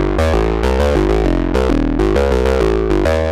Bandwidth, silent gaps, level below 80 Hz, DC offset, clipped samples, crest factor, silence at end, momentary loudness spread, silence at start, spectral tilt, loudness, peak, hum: 13 kHz; none; -18 dBFS; under 0.1%; under 0.1%; 12 dB; 0 s; 1 LU; 0 s; -7 dB/octave; -15 LUFS; -2 dBFS; none